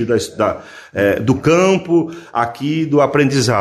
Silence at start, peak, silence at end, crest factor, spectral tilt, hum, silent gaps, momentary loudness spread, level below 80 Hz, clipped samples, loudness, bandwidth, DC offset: 0 s; -2 dBFS; 0 s; 14 dB; -5.5 dB/octave; none; none; 7 LU; -44 dBFS; under 0.1%; -16 LUFS; 14 kHz; under 0.1%